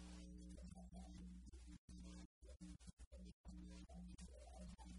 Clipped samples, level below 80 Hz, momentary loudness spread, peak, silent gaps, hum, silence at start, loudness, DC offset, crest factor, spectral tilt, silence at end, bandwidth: under 0.1%; -62 dBFS; 4 LU; -46 dBFS; 1.78-1.88 s, 2.25-2.42 s, 2.93-2.97 s, 3.07-3.11 s, 3.33-3.44 s; none; 0 s; -61 LUFS; under 0.1%; 14 dB; -5.5 dB/octave; 0 s; 11 kHz